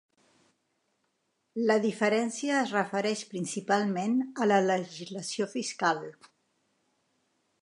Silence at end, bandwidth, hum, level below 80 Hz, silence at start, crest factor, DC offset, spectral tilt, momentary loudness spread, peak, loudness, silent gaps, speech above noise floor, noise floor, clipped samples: 1.5 s; 11.5 kHz; none; -84 dBFS; 1.55 s; 20 dB; under 0.1%; -4.5 dB/octave; 10 LU; -10 dBFS; -29 LUFS; none; 49 dB; -77 dBFS; under 0.1%